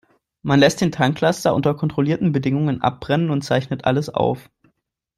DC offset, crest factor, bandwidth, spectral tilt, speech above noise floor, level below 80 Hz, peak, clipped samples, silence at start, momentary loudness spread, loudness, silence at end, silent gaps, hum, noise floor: under 0.1%; 18 dB; 13.5 kHz; -6 dB/octave; 49 dB; -52 dBFS; 0 dBFS; under 0.1%; 0.45 s; 6 LU; -19 LUFS; 0.75 s; none; none; -68 dBFS